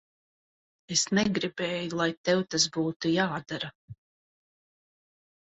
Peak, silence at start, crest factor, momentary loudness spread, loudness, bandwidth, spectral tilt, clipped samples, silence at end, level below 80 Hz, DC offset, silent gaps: -10 dBFS; 0.9 s; 22 dB; 9 LU; -28 LUFS; 8.4 kHz; -3.5 dB/octave; under 0.1%; 1.65 s; -66 dBFS; under 0.1%; 2.17-2.24 s, 2.96-3.00 s, 3.75-3.88 s